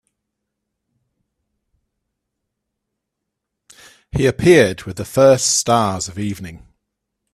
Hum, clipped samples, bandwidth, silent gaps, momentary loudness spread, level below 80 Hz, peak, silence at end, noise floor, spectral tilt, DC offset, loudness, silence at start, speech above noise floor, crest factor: none; under 0.1%; 14.5 kHz; none; 15 LU; -46 dBFS; 0 dBFS; 0.75 s; -79 dBFS; -4.5 dB/octave; under 0.1%; -15 LUFS; 4.15 s; 64 dB; 20 dB